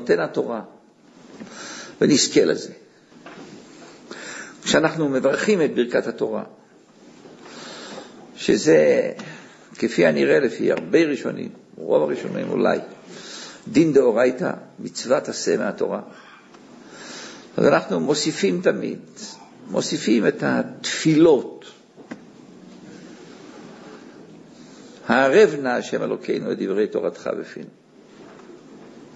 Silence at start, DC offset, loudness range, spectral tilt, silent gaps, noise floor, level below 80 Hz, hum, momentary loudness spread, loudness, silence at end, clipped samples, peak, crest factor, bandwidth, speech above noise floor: 0 s; under 0.1%; 5 LU; -4.5 dB/octave; none; -50 dBFS; -64 dBFS; none; 25 LU; -20 LUFS; 0.1 s; under 0.1%; -2 dBFS; 20 dB; 8 kHz; 30 dB